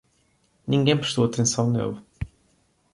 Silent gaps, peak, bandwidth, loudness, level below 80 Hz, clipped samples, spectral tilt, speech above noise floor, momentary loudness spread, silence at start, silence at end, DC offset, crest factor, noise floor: none; -8 dBFS; 11.5 kHz; -23 LUFS; -50 dBFS; under 0.1%; -5 dB/octave; 43 dB; 17 LU; 0.65 s; 0.7 s; under 0.1%; 18 dB; -65 dBFS